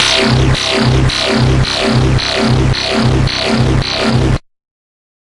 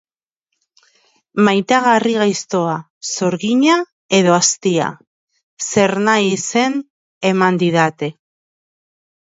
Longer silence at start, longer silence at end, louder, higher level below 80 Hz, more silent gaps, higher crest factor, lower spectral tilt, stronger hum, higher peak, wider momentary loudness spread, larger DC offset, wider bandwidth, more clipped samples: second, 0 s vs 1.35 s; second, 0.9 s vs 1.25 s; first, -12 LUFS vs -16 LUFS; first, -22 dBFS vs -64 dBFS; second, none vs 2.90-3.01 s, 3.92-4.09 s, 5.07-5.28 s, 5.43-5.57 s, 6.90-7.21 s; second, 12 dB vs 18 dB; about the same, -5 dB/octave vs -4 dB/octave; neither; about the same, 0 dBFS vs 0 dBFS; second, 2 LU vs 11 LU; neither; first, 11.5 kHz vs 8 kHz; neither